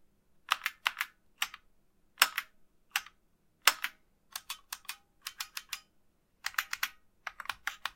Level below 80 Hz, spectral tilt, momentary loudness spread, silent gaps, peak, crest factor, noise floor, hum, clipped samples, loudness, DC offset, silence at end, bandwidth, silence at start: -72 dBFS; 3 dB/octave; 17 LU; none; 0 dBFS; 38 dB; -70 dBFS; none; under 0.1%; -34 LUFS; under 0.1%; 0.05 s; 17 kHz; 0.5 s